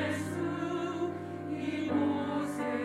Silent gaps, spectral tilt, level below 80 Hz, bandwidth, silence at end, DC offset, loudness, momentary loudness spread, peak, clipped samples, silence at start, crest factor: none; -6 dB/octave; -74 dBFS; 13.5 kHz; 0 s; under 0.1%; -34 LUFS; 6 LU; -20 dBFS; under 0.1%; 0 s; 14 dB